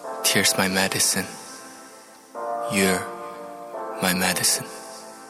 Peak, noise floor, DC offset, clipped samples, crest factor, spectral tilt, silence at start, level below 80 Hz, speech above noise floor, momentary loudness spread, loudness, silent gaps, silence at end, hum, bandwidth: -6 dBFS; -46 dBFS; under 0.1%; under 0.1%; 20 dB; -2 dB/octave; 0 s; -68 dBFS; 24 dB; 20 LU; -21 LUFS; none; 0 s; none; 17 kHz